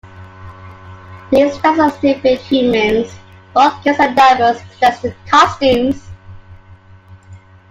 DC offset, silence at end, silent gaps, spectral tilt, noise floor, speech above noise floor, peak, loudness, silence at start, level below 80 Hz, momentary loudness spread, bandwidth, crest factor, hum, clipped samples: under 0.1%; 0.35 s; none; -5 dB/octave; -41 dBFS; 29 dB; 0 dBFS; -13 LUFS; 0.05 s; -46 dBFS; 9 LU; 15.5 kHz; 14 dB; none; under 0.1%